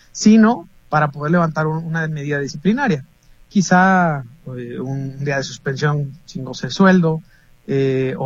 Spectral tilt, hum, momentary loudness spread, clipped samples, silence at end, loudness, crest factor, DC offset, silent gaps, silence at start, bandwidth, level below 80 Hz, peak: -6 dB/octave; none; 14 LU; under 0.1%; 0 s; -18 LUFS; 18 dB; under 0.1%; none; 0.15 s; 7.8 kHz; -52 dBFS; 0 dBFS